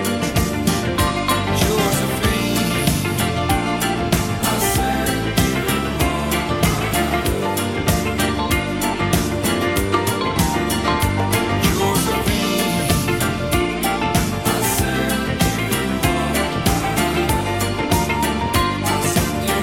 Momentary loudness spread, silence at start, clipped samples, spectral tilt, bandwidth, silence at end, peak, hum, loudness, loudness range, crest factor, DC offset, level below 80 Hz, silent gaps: 2 LU; 0 s; under 0.1%; -4.5 dB/octave; 17 kHz; 0 s; -2 dBFS; none; -19 LUFS; 1 LU; 18 dB; 0.3%; -30 dBFS; none